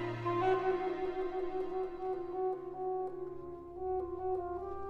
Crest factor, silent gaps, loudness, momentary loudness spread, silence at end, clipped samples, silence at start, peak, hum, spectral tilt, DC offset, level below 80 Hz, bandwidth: 16 dB; none; -37 LUFS; 10 LU; 0 s; under 0.1%; 0 s; -20 dBFS; none; -8 dB/octave; under 0.1%; -58 dBFS; 6.2 kHz